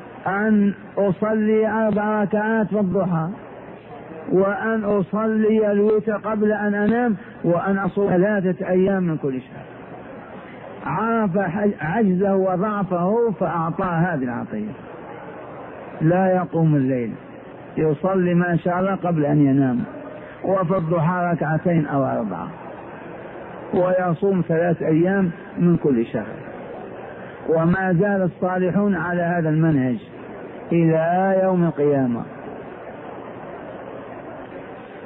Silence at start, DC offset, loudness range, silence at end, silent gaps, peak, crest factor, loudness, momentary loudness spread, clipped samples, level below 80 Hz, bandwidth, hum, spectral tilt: 0 s; under 0.1%; 3 LU; 0 s; none; -8 dBFS; 14 dB; -20 LUFS; 18 LU; under 0.1%; -54 dBFS; 3.8 kHz; none; -13 dB/octave